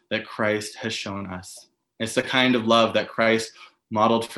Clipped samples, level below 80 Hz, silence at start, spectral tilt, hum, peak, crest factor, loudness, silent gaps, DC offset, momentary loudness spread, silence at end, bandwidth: under 0.1%; -66 dBFS; 0.1 s; -4 dB/octave; none; -2 dBFS; 22 dB; -23 LUFS; none; under 0.1%; 15 LU; 0 s; 12.5 kHz